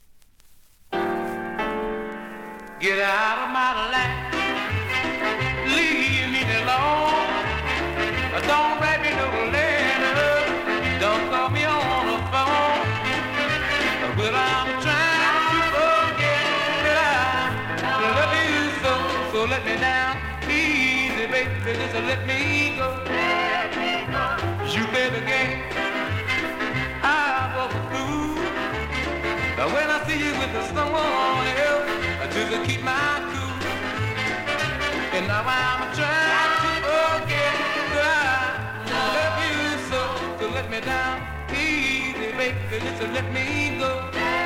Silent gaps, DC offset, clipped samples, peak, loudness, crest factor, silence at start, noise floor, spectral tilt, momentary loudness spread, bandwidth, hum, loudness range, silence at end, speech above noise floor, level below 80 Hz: none; under 0.1%; under 0.1%; -6 dBFS; -22 LUFS; 16 dB; 0.15 s; -51 dBFS; -4.5 dB/octave; 7 LU; 16.5 kHz; none; 4 LU; 0 s; 29 dB; -44 dBFS